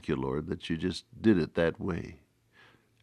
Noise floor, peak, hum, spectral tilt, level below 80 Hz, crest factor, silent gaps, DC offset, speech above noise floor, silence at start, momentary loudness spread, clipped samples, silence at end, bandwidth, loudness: -62 dBFS; -12 dBFS; none; -7 dB/octave; -54 dBFS; 20 dB; none; under 0.1%; 32 dB; 0.05 s; 9 LU; under 0.1%; 0.85 s; 11 kHz; -31 LUFS